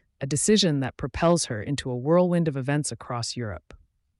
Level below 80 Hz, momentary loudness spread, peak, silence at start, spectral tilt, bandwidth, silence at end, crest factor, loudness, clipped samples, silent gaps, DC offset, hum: -50 dBFS; 10 LU; -10 dBFS; 0.2 s; -5 dB/octave; 11.5 kHz; 0.6 s; 16 dB; -25 LUFS; under 0.1%; none; under 0.1%; none